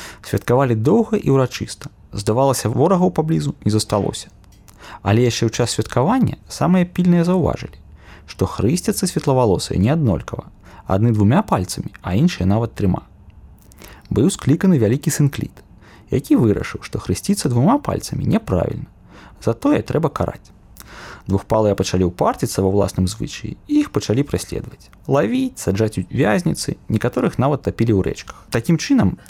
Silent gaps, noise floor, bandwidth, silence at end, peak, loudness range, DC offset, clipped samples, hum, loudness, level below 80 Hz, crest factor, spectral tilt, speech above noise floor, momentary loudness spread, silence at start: none; -44 dBFS; 16 kHz; 0.15 s; -4 dBFS; 3 LU; under 0.1%; under 0.1%; none; -19 LUFS; -40 dBFS; 14 dB; -6.5 dB/octave; 26 dB; 12 LU; 0 s